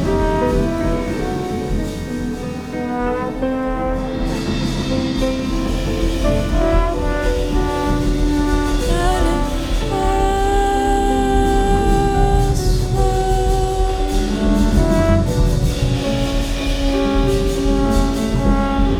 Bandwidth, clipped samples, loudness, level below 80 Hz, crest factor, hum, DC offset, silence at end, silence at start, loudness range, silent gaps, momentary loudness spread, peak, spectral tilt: 14.5 kHz; under 0.1%; -18 LUFS; -20 dBFS; 16 dB; none; 0.5%; 0 s; 0 s; 5 LU; none; 6 LU; -2 dBFS; -6 dB/octave